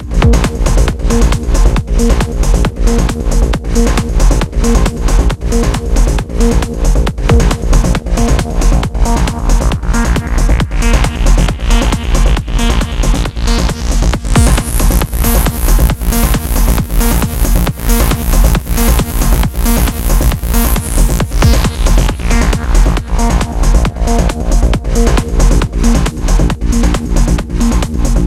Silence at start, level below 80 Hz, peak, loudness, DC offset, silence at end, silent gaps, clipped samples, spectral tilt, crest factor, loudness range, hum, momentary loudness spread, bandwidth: 0 s; -10 dBFS; 0 dBFS; -13 LUFS; under 0.1%; 0 s; none; 0.1%; -5 dB/octave; 10 dB; 1 LU; none; 2 LU; 16.5 kHz